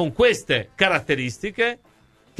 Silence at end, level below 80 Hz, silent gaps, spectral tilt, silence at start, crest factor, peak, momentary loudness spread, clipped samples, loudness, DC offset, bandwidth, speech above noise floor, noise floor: 0.65 s; -48 dBFS; none; -4 dB/octave; 0 s; 20 dB; -2 dBFS; 7 LU; under 0.1%; -21 LUFS; under 0.1%; 13 kHz; 22 dB; -44 dBFS